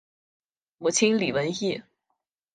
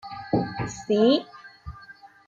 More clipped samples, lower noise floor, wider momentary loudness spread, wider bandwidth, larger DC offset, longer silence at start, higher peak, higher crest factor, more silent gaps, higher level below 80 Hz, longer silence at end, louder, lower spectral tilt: neither; first, -80 dBFS vs -49 dBFS; second, 9 LU vs 23 LU; first, 9.8 kHz vs 7.8 kHz; neither; first, 0.8 s vs 0.05 s; about the same, -10 dBFS vs -10 dBFS; about the same, 20 dB vs 16 dB; neither; second, -66 dBFS vs -52 dBFS; first, 0.75 s vs 0.2 s; about the same, -25 LUFS vs -24 LUFS; second, -3.5 dB/octave vs -6 dB/octave